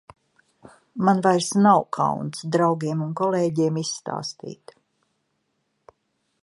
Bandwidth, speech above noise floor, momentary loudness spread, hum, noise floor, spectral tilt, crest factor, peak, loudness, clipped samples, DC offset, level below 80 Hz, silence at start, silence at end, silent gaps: 11.5 kHz; 52 dB; 14 LU; none; -73 dBFS; -5.5 dB/octave; 20 dB; -4 dBFS; -22 LUFS; under 0.1%; under 0.1%; -68 dBFS; 0.95 s; 1.9 s; none